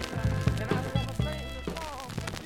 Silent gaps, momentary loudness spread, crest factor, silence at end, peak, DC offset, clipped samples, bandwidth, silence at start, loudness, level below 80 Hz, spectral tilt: none; 8 LU; 20 dB; 0 s; -12 dBFS; under 0.1%; under 0.1%; 17 kHz; 0 s; -32 LUFS; -40 dBFS; -6 dB/octave